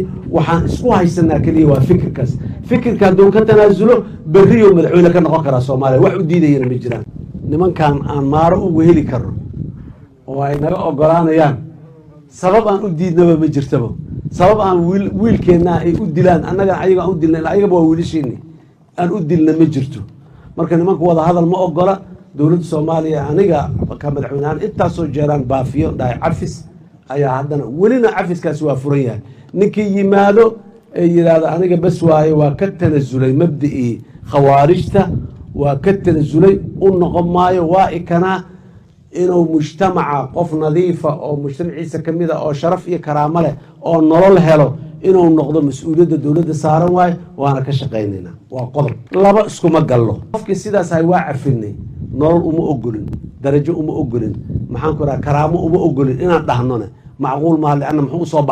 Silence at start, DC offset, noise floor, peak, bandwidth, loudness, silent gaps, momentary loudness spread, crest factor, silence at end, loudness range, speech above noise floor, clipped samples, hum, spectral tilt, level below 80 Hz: 0 s; under 0.1%; -42 dBFS; 0 dBFS; 9.8 kHz; -13 LUFS; none; 12 LU; 12 dB; 0 s; 6 LU; 29 dB; under 0.1%; none; -8.5 dB/octave; -38 dBFS